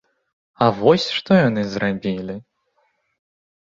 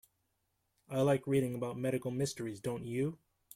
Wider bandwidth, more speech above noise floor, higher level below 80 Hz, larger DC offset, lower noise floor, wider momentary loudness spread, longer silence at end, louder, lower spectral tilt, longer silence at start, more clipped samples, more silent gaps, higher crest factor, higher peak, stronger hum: second, 7.6 kHz vs 16 kHz; about the same, 49 dB vs 46 dB; first, -56 dBFS vs -70 dBFS; neither; second, -67 dBFS vs -81 dBFS; first, 12 LU vs 8 LU; first, 1.2 s vs 0.4 s; first, -19 LUFS vs -35 LUFS; about the same, -6.5 dB/octave vs -6.5 dB/octave; second, 0.6 s vs 0.9 s; neither; neither; about the same, 20 dB vs 18 dB; first, -2 dBFS vs -18 dBFS; neither